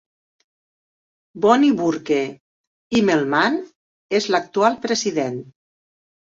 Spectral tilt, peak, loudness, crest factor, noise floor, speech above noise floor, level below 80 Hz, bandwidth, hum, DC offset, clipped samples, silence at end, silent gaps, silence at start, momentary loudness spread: -4.5 dB/octave; -2 dBFS; -19 LUFS; 20 dB; under -90 dBFS; over 71 dB; -62 dBFS; 7.8 kHz; none; under 0.1%; under 0.1%; 0.95 s; 2.40-2.90 s, 3.75-4.09 s; 1.35 s; 10 LU